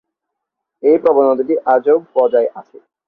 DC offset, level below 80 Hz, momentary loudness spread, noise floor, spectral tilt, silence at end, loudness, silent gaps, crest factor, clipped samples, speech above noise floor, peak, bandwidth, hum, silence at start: under 0.1%; -64 dBFS; 5 LU; -78 dBFS; -8.5 dB/octave; 0.45 s; -14 LUFS; none; 14 dB; under 0.1%; 65 dB; -2 dBFS; 4.5 kHz; none; 0.85 s